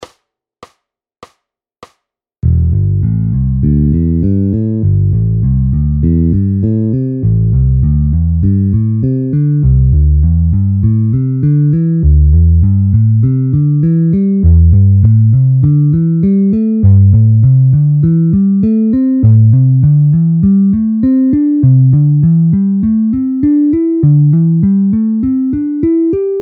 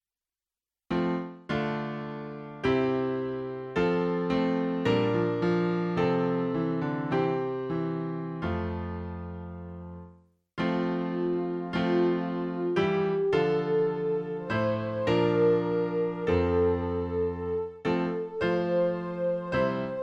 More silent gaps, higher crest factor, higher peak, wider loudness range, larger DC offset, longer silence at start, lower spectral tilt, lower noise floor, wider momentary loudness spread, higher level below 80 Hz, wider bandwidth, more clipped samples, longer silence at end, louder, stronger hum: neither; second, 10 dB vs 16 dB; first, 0 dBFS vs -14 dBFS; about the same, 4 LU vs 6 LU; neither; second, 0 s vs 0.9 s; first, -13.5 dB/octave vs -8.5 dB/octave; second, -68 dBFS vs under -90 dBFS; second, 5 LU vs 9 LU; first, -20 dBFS vs -52 dBFS; second, 2.3 kHz vs 7.4 kHz; neither; about the same, 0 s vs 0 s; first, -10 LUFS vs -28 LUFS; neither